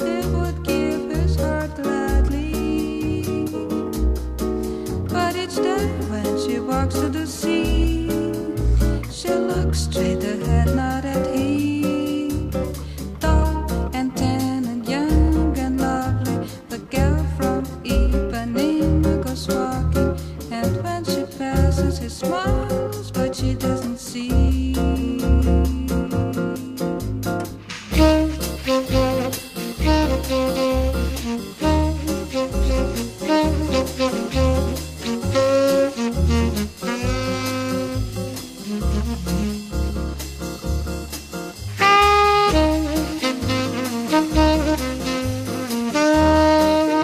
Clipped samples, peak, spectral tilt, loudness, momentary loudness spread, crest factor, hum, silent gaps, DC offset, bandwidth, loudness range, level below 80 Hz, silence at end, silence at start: under 0.1%; -2 dBFS; -6 dB/octave; -21 LUFS; 9 LU; 18 dB; none; none; under 0.1%; 15.5 kHz; 5 LU; -26 dBFS; 0 s; 0 s